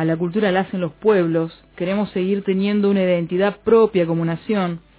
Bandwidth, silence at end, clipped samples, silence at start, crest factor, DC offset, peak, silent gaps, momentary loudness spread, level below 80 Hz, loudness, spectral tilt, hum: 4 kHz; 0.2 s; under 0.1%; 0 s; 16 dB; under 0.1%; -4 dBFS; none; 7 LU; -54 dBFS; -19 LUFS; -11.5 dB/octave; none